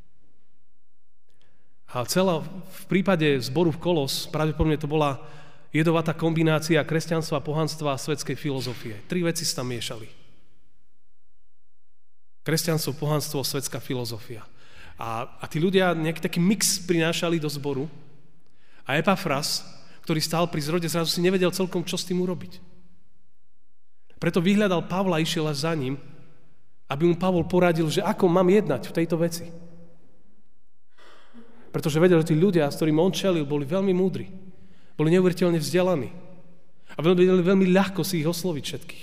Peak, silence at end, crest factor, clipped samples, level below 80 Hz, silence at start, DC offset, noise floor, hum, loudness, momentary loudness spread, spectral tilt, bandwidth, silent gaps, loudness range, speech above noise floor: -8 dBFS; 0 s; 18 dB; under 0.1%; -54 dBFS; 1.9 s; 1%; -85 dBFS; none; -24 LUFS; 13 LU; -5.5 dB/octave; 15.5 kHz; none; 6 LU; 61 dB